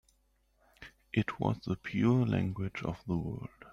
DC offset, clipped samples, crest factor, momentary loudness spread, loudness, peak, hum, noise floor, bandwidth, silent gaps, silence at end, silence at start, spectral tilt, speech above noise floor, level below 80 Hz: under 0.1%; under 0.1%; 18 dB; 17 LU; -33 LUFS; -16 dBFS; none; -72 dBFS; 7.4 kHz; none; 0 s; 0.8 s; -8.5 dB/octave; 40 dB; -58 dBFS